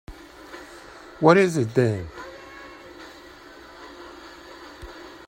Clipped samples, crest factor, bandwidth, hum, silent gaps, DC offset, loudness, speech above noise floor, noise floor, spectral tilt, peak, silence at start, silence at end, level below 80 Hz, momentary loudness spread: under 0.1%; 24 dB; 16 kHz; none; none; under 0.1%; -20 LUFS; 26 dB; -45 dBFS; -6.5 dB/octave; -2 dBFS; 0.1 s; 0.2 s; -54 dBFS; 26 LU